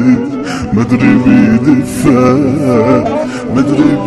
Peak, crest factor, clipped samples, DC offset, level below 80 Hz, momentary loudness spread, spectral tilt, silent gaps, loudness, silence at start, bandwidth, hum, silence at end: 0 dBFS; 10 dB; 1%; under 0.1%; -36 dBFS; 8 LU; -7.5 dB/octave; none; -10 LUFS; 0 s; 12.5 kHz; none; 0 s